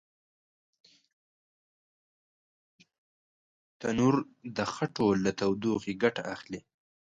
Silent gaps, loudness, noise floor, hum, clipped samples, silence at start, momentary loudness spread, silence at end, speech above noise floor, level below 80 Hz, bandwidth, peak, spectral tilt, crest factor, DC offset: none; -30 LUFS; under -90 dBFS; none; under 0.1%; 3.8 s; 12 LU; 0.45 s; over 61 dB; -66 dBFS; 9.2 kHz; -10 dBFS; -6 dB/octave; 22 dB; under 0.1%